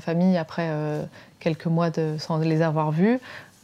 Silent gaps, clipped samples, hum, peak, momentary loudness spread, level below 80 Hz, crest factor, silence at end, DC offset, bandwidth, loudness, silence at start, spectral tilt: none; under 0.1%; none; -8 dBFS; 8 LU; -68 dBFS; 16 dB; 0.2 s; under 0.1%; 8.2 kHz; -24 LUFS; 0 s; -8 dB/octave